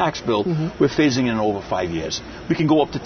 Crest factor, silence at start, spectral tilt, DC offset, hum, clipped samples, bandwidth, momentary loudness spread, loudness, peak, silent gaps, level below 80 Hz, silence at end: 16 dB; 0 s; -5.5 dB/octave; under 0.1%; none; under 0.1%; 6.6 kHz; 8 LU; -21 LUFS; -4 dBFS; none; -46 dBFS; 0 s